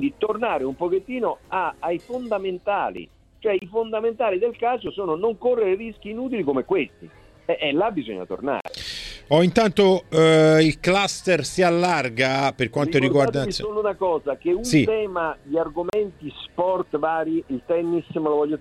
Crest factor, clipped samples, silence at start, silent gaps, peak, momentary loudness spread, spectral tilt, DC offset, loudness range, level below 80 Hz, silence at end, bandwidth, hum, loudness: 18 dB; under 0.1%; 0 s; none; -4 dBFS; 11 LU; -5.5 dB/octave; under 0.1%; 7 LU; -50 dBFS; 0 s; 13.5 kHz; none; -22 LUFS